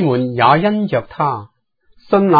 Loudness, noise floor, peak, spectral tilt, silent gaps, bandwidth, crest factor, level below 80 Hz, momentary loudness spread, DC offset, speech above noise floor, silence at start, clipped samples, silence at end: -16 LUFS; -53 dBFS; 0 dBFS; -10 dB/octave; none; 5 kHz; 16 dB; -52 dBFS; 8 LU; under 0.1%; 39 dB; 0 s; under 0.1%; 0 s